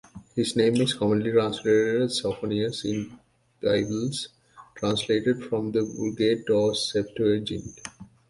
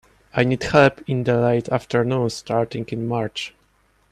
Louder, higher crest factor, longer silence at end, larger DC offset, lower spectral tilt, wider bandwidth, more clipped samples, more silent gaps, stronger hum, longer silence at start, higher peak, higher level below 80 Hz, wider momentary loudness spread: second, -25 LUFS vs -21 LUFS; about the same, 16 dB vs 20 dB; second, 0.25 s vs 0.65 s; neither; second, -5 dB/octave vs -6.5 dB/octave; about the same, 11.5 kHz vs 12 kHz; neither; neither; neither; second, 0.15 s vs 0.35 s; second, -8 dBFS vs -2 dBFS; second, -58 dBFS vs -50 dBFS; about the same, 11 LU vs 11 LU